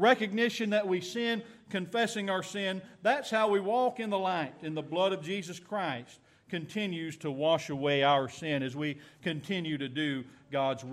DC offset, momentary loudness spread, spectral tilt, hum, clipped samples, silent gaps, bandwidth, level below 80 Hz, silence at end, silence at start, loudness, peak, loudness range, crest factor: under 0.1%; 10 LU; -5 dB/octave; none; under 0.1%; none; 14.5 kHz; -76 dBFS; 0 s; 0 s; -32 LUFS; -12 dBFS; 3 LU; 20 dB